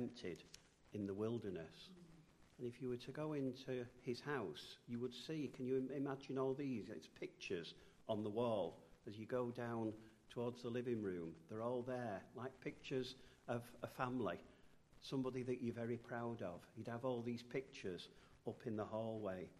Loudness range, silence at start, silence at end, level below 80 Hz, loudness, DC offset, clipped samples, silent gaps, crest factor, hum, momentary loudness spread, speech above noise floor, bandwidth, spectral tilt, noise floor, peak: 3 LU; 0 s; 0 s; -76 dBFS; -47 LUFS; under 0.1%; under 0.1%; none; 20 dB; none; 11 LU; 21 dB; 13 kHz; -6.5 dB/octave; -67 dBFS; -26 dBFS